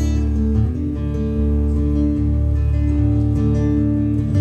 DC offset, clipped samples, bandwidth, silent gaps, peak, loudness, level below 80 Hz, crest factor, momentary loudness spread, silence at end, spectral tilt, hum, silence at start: under 0.1%; under 0.1%; 7 kHz; none; -6 dBFS; -19 LUFS; -20 dBFS; 12 dB; 4 LU; 0 s; -9.5 dB/octave; none; 0 s